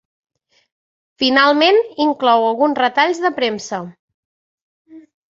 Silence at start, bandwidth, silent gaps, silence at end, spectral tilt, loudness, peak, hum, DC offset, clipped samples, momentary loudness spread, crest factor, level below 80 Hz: 1.2 s; 7.8 kHz; 3.99-4.08 s, 4.14-4.85 s; 0.4 s; -3.5 dB/octave; -15 LUFS; 0 dBFS; none; under 0.1%; under 0.1%; 13 LU; 18 dB; -66 dBFS